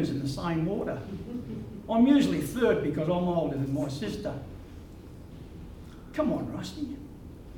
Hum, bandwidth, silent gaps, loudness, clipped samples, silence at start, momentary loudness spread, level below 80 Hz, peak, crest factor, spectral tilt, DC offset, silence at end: none; 18 kHz; none; -29 LUFS; under 0.1%; 0 s; 22 LU; -50 dBFS; -10 dBFS; 18 dB; -7 dB/octave; under 0.1%; 0 s